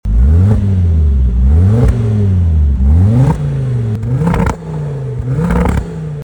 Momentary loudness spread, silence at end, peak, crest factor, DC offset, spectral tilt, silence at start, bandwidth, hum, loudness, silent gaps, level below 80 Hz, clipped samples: 9 LU; 0 s; -2 dBFS; 10 dB; under 0.1%; -9 dB/octave; 0.05 s; 9.4 kHz; none; -13 LUFS; none; -14 dBFS; under 0.1%